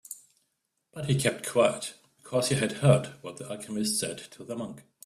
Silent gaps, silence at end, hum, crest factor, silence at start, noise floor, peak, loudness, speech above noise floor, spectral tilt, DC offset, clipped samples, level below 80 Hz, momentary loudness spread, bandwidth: none; 0.25 s; none; 22 dB; 0.1 s; -79 dBFS; -8 dBFS; -28 LUFS; 51 dB; -5 dB/octave; under 0.1%; under 0.1%; -62 dBFS; 18 LU; 14.5 kHz